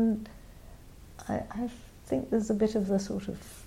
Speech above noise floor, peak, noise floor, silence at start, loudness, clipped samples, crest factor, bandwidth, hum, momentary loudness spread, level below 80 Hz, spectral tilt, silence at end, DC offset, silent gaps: 19 dB; -16 dBFS; -50 dBFS; 0 s; -32 LUFS; under 0.1%; 16 dB; 16 kHz; none; 25 LU; -52 dBFS; -7 dB/octave; 0 s; under 0.1%; none